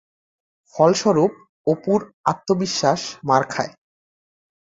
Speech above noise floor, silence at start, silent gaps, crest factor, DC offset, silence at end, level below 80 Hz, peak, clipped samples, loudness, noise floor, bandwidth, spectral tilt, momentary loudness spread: over 71 dB; 0.75 s; 1.49-1.65 s, 2.14-2.24 s; 20 dB; under 0.1%; 1 s; -62 dBFS; -2 dBFS; under 0.1%; -20 LUFS; under -90 dBFS; 8 kHz; -5 dB/octave; 10 LU